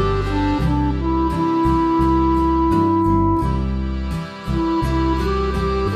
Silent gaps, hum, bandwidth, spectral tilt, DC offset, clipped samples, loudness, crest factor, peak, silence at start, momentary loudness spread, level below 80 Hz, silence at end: none; none; 11.5 kHz; -8 dB/octave; under 0.1%; under 0.1%; -19 LUFS; 14 dB; -4 dBFS; 0 s; 7 LU; -26 dBFS; 0 s